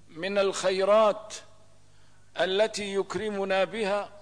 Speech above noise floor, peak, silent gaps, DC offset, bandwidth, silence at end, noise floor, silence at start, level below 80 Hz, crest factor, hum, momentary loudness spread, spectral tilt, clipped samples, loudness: 33 dB; -14 dBFS; none; 0.3%; 10.5 kHz; 0 s; -60 dBFS; 0.15 s; -66 dBFS; 14 dB; 50 Hz at -65 dBFS; 13 LU; -3.5 dB/octave; under 0.1%; -27 LUFS